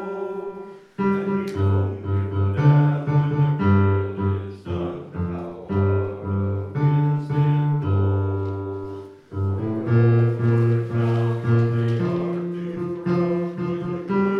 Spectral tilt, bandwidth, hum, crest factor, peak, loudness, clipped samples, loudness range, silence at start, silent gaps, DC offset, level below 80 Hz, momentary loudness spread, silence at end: -10 dB/octave; 6 kHz; none; 16 dB; -4 dBFS; -22 LUFS; under 0.1%; 3 LU; 0 s; none; under 0.1%; -54 dBFS; 11 LU; 0 s